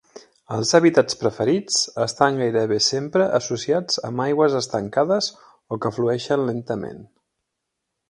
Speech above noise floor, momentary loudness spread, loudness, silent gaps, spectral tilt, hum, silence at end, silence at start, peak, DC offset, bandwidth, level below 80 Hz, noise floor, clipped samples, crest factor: 59 dB; 10 LU; -21 LUFS; none; -4 dB/octave; none; 1.05 s; 0.15 s; 0 dBFS; under 0.1%; 11 kHz; -62 dBFS; -80 dBFS; under 0.1%; 22 dB